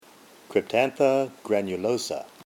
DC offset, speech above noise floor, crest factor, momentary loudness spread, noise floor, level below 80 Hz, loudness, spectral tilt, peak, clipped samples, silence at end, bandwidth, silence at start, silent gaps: under 0.1%; 27 dB; 18 dB; 7 LU; -52 dBFS; -72 dBFS; -25 LUFS; -4.5 dB/octave; -8 dBFS; under 0.1%; 0.2 s; 17 kHz; 0.5 s; none